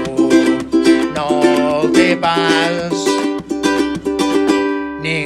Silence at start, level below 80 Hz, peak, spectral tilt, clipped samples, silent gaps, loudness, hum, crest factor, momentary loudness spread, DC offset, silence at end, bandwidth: 0 s; -46 dBFS; 0 dBFS; -4.5 dB/octave; under 0.1%; none; -15 LUFS; none; 14 dB; 6 LU; under 0.1%; 0 s; 13 kHz